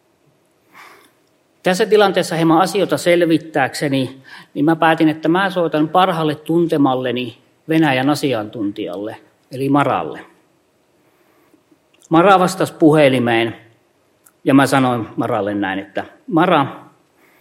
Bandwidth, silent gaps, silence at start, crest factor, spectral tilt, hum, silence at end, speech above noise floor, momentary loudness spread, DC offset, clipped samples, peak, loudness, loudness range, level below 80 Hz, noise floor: 16.5 kHz; none; 1.65 s; 18 dB; -6 dB/octave; none; 0.6 s; 43 dB; 12 LU; under 0.1%; under 0.1%; 0 dBFS; -16 LUFS; 5 LU; -64 dBFS; -59 dBFS